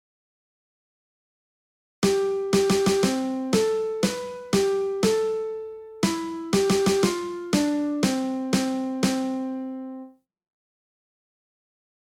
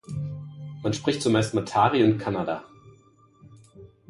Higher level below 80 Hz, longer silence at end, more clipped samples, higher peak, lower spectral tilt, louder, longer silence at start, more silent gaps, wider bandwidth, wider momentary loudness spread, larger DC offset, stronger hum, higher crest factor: about the same, -56 dBFS vs -56 dBFS; first, 1.95 s vs 0.25 s; neither; about the same, -8 dBFS vs -6 dBFS; about the same, -5 dB/octave vs -6 dB/octave; about the same, -24 LUFS vs -25 LUFS; first, 2 s vs 0.1 s; neither; first, 16.5 kHz vs 11.5 kHz; second, 11 LU vs 15 LU; neither; neither; about the same, 18 dB vs 20 dB